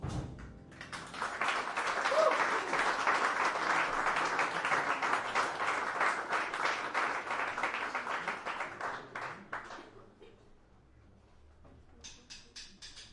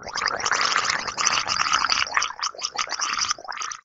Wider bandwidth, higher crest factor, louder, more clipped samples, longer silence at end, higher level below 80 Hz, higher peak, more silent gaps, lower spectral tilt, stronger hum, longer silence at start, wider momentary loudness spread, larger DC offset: first, 11.5 kHz vs 8.2 kHz; about the same, 20 dB vs 24 dB; second, -33 LUFS vs -23 LUFS; neither; about the same, 0 s vs 0.05 s; about the same, -60 dBFS vs -58 dBFS; second, -14 dBFS vs 0 dBFS; neither; first, -3 dB/octave vs 1 dB/octave; neither; about the same, 0 s vs 0 s; first, 19 LU vs 7 LU; neither